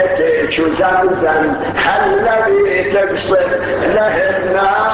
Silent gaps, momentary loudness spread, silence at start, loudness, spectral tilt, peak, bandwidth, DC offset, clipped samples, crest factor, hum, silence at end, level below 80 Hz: none; 3 LU; 0 s; -13 LUFS; -9 dB/octave; -2 dBFS; 4 kHz; under 0.1%; under 0.1%; 12 dB; none; 0 s; -40 dBFS